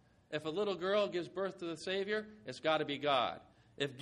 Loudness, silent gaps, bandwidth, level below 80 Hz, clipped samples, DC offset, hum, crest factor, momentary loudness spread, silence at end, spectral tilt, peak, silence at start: -37 LUFS; none; 11 kHz; -76 dBFS; under 0.1%; under 0.1%; none; 18 dB; 9 LU; 0 s; -5 dB/octave; -18 dBFS; 0.3 s